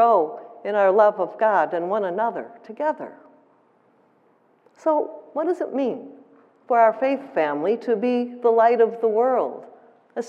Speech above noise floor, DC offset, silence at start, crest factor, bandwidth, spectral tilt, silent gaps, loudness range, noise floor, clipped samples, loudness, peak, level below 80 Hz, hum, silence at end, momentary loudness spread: 40 dB; under 0.1%; 0 s; 18 dB; 7.6 kHz; -6.5 dB/octave; none; 8 LU; -60 dBFS; under 0.1%; -21 LUFS; -4 dBFS; under -90 dBFS; none; 0 s; 13 LU